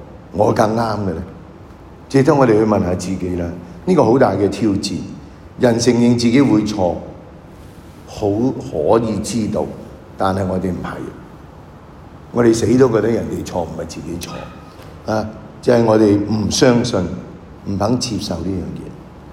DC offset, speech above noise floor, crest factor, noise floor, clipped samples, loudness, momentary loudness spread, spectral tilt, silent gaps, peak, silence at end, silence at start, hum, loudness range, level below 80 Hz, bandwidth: under 0.1%; 23 dB; 16 dB; -38 dBFS; under 0.1%; -17 LUFS; 19 LU; -6 dB/octave; none; 0 dBFS; 0 s; 0 s; none; 5 LU; -42 dBFS; 15.5 kHz